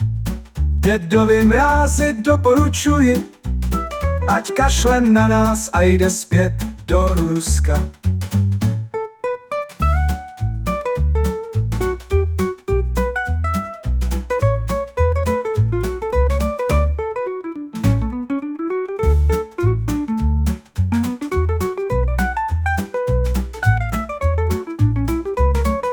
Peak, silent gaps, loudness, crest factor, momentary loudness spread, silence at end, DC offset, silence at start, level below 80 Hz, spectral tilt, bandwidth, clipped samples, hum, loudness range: -2 dBFS; none; -19 LUFS; 14 dB; 9 LU; 0 s; under 0.1%; 0 s; -24 dBFS; -6 dB/octave; 19.5 kHz; under 0.1%; none; 5 LU